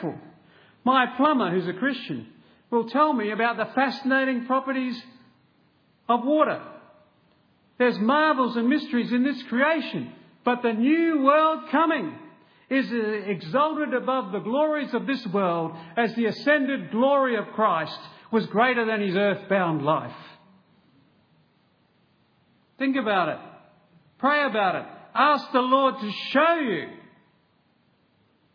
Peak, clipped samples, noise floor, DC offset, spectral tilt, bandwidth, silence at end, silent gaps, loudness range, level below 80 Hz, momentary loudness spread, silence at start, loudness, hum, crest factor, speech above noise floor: -6 dBFS; under 0.1%; -65 dBFS; under 0.1%; -7.5 dB/octave; 5.4 kHz; 1.55 s; none; 5 LU; -80 dBFS; 11 LU; 0 s; -24 LUFS; none; 20 dB; 42 dB